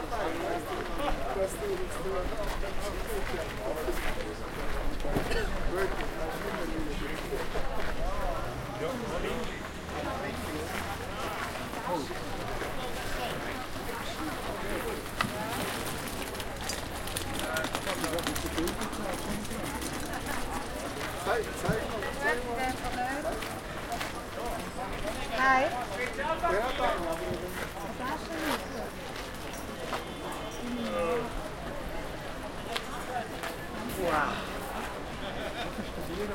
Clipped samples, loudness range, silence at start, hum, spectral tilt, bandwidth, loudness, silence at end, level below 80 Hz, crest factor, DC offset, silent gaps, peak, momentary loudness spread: under 0.1%; 5 LU; 0 s; none; -4 dB/octave; 17 kHz; -34 LUFS; 0 s; -42 dBFS; 22 dB; under 0.1%; none; -10 dBFS; 7 LU